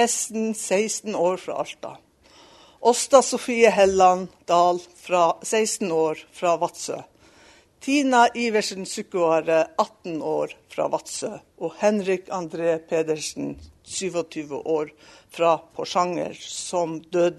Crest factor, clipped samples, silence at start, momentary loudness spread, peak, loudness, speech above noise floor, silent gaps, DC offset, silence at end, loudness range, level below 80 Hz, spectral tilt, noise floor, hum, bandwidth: 22 dB; under 0.1%; 0 s; 14 LU; -2 dBFS; -23 LUFS; 31 dB; none; under 0.1%; 0 s; 7 LU; -62 dBFS; -3.5 dB/octave; -53 dBFS; none; 12.5 kHz